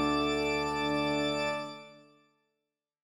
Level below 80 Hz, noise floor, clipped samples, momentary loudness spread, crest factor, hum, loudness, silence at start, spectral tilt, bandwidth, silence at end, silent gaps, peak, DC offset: -56 dBFS; -88 dBFS; under 0.1%; 10 LU; 14 dB; none; -31 LUFS; 0 s; -4.5 dB/octave; 16.5 kHz; 1.05 s; none; -18 dBFS; under 0.1%